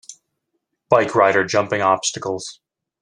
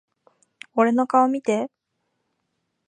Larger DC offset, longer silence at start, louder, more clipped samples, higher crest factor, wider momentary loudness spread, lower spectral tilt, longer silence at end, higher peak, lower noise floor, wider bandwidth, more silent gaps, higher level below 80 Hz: neither; second, 0.1 s vs 0.75 s; first, -18 LUFS vs -21 LUFS; neither; about the same, 18 dB vs 20 dB; about the same, 12 LU vs 10 LU; second, -3.5 dB/octave vs -6 dB/octave; second, 0.5 s vs 1.2 s; about the same, -2 dBFS vs -4 dBFS; about the same, -75 dBFS vs -76 dBFS; first, 11 kHz vs 9.8 kHz; neither; first, -62 dBFS vs -78 dBFS